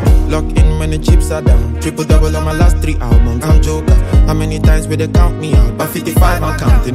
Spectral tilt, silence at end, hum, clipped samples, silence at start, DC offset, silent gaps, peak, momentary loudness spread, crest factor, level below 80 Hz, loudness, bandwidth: -6.5 dB/octave; 0 s; none; under 0.1%; 0 s; under 0.1%; none; 0 dBFS; 3 LU; 10 dB; -12 dBFS; -13 LUFS; 15.5 kHz